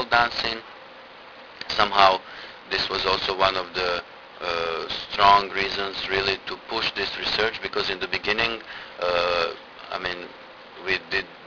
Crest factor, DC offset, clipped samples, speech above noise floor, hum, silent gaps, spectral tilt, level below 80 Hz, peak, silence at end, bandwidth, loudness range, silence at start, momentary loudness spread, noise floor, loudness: 24 dB; under 0.1%; under 0.1%; 20 dB; none; none; -3.5 dB/octave; -52 dBFS; 0 dBFS; 0 s; 5.4 kHz; 3 LU; 0 s; 20 LU; -44 dBFS; -23 LUFS